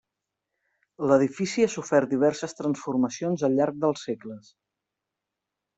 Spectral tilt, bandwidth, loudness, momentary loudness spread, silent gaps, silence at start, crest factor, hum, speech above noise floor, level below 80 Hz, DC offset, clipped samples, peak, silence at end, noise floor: -5.5 dB/octave; 8.2 kHz; -25 LUFS; 11 LU; none; 1 s; 20 dB; none; 61 dB; -70 dBFS; under 0.1%; under 0.1%; -6 dBFS; 1.4 s; -86 dBFS